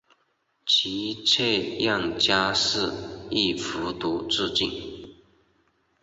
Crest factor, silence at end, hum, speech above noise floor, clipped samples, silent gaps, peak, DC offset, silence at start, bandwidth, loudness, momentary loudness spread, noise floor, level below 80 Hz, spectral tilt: 20 dB; 0.9 s; none; 45 dB; under 0.1%; none; -6 dBFS; under 0.1%; 0.65 s; 8.2 kHz; -24 LUFS; 11 LU; -71 dBFS; -54 dBFS; -3 dB/octave